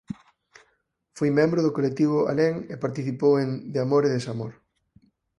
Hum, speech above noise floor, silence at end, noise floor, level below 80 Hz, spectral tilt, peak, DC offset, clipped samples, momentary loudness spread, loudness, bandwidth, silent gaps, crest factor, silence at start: none; 48 dB; 0.85 s; -71 dBFS; -64 dBFS; -7.5 dB/octave; -8 dBFS; under 0.1%; under 0.1%; 12 LU; -24 LUFS; 11 kHz; none; 18 dB; 0.1 s